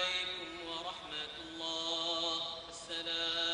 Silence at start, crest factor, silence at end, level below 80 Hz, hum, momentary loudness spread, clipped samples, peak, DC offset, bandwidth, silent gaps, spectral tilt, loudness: 0 s; 16 dB; 0 s; -68 dBFS; none; 8 LU; under 0.1%; -22 dBFS; under 0.1%; 11 kHz; none; -1 dB/octave; -37 LUFS